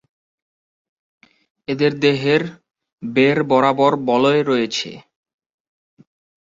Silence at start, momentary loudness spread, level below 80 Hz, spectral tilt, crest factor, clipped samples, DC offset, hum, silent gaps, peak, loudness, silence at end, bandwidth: 1.7 s; 15 LU; -62 dBFS; -5.5 dB/octave; 18 dB; under 0.1%; under 0.1%; none; 2.93-2.98 s; -2 dBFS; -17 LUFS; 1.45 s; 7.8 kHz